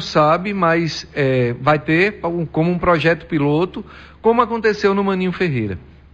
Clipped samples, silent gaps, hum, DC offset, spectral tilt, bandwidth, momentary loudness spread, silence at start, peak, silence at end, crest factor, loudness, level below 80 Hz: under 0.1%; none; none; under 0.1%; -7 dB/octave; 7.8 kHz; 8 LU; 0 s; -4 dBFS; 0.35 s; 14 dB; -18 LUFS; -44 dBFS